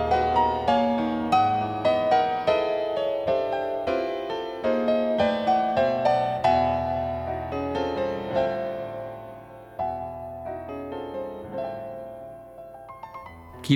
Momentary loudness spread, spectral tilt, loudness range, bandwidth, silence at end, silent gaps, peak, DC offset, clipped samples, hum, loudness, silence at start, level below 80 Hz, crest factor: 19 LU; -6.5 dB/octave; 11 LU; 19 kHz; 0 s; none; -6 dBFS; under 0.1%; under 0.1%; none; -25 LUFS; 0 s; -52 dBFS; 20 dB